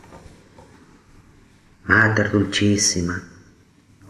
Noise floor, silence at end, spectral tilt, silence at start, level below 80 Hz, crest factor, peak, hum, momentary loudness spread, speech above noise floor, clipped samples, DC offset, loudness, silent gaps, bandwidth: -53 dBFS; 0.85 s; -3.5 dB/octave; 0.1 s; -50 dBFS; 22 dB; 0 dBFS; none; 14 LU; 35 dB; under 0.1%; under 0.1%; -18 LUFS; none; 13 kHz